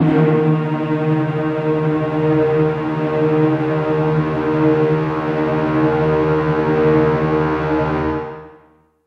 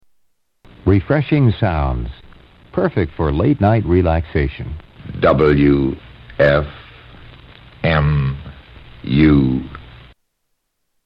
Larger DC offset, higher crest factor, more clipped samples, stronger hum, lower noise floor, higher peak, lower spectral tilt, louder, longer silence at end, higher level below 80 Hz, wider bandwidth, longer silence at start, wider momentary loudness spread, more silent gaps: neither; about the same, 14 dB vs 16 dB; neither; neither; second, -51 dBFS vs -70 dBFS; about the same, -4 dBFS vs -2 dBFS; about the same, -9.5 dB/octave vs -10.5 dB/octave; about the same, -17 LUFS vs -16 LUFS; second, 0.55 s vs 1.15 s; second, -40 dBFS vs -30 dBFS; first, 6.2 kHz vs 5.4 kHz; second, 0 s vs 0.85 s; second, 5 LU vs 19 LU; neither